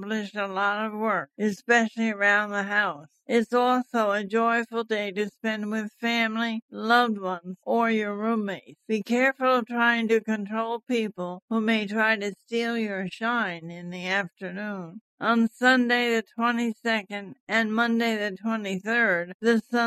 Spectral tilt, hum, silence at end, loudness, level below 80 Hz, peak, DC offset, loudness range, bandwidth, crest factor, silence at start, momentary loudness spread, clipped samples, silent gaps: -5 dB/octave; none; 0 s; -25 LUFS; -80 dBFS; -8 dBFS; under 0.1%; 3 LU; 13.5 kHz; 18 dB; 0 s; 10 LU; under 0.1%; 6.62-6.68 s, 11.42-11.48 s, 15.01-15.18 s, 17.40-17.47 s, 19.34-19.40 s